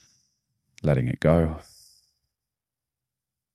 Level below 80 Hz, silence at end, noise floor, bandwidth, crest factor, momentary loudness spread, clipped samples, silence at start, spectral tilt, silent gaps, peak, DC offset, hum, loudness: -44 dBFS; 1.95 s; -89 dBFS; 12 kHz; 24 dB; 8 LU; under 0.1%; 0.85 s; -8.5 dB/octave; none; -6 dBFS; under 0.1%; none; -24 LUFS